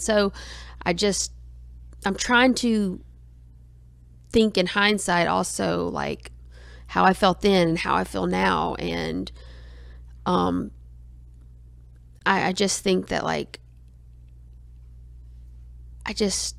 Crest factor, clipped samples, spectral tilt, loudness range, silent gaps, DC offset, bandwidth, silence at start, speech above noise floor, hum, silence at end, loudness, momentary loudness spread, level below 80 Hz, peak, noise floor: 20 dB; under 0.1%; -4 dB/octave; 7 LU; none; under 0.1%; 15 kHz; 0 s; 26 dB; none; 0 s; -23 LUFS; 18 LU; -44 dBFS; -4 dBFS; -49 dBFS